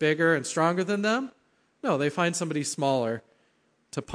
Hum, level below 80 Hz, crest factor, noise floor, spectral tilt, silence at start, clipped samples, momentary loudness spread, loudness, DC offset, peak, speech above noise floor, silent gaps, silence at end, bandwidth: none; -68 dBFS; 18 dB; -68 dBFS; -4.5 dB/octave; 0 s; under 0.1%; 13 LU; -27 LUFS; under 0.1%; -10 dBFS; 42 dB; none; 0 s; 10.5 kHz